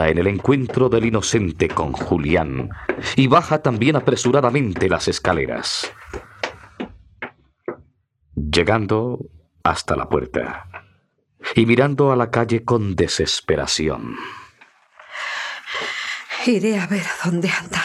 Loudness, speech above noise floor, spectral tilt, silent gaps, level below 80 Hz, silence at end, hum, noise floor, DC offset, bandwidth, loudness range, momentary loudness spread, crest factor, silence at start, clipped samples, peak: -20 LUFS; 43 dB; -5 dB/octave; none; -42 dBFS; 0 s; none; -62 dBFS; under 0.1%; 13 kHz; 6 LU; 18 LU; 20 dB; 0 s; under 0.1%; 0 dBFS